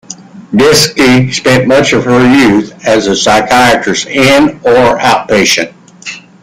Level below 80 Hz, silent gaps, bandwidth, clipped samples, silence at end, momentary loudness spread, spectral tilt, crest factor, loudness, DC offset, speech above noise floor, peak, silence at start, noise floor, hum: -38 dBFS; none; 16.5 kHz; under 0.1%; 0.25 s; 14 LU; -4 dB/octave; 8 dB; -7 LUFS; under 0.1%; 22 dB; 0 dBFS; 0.1 s; -29 dBFS; none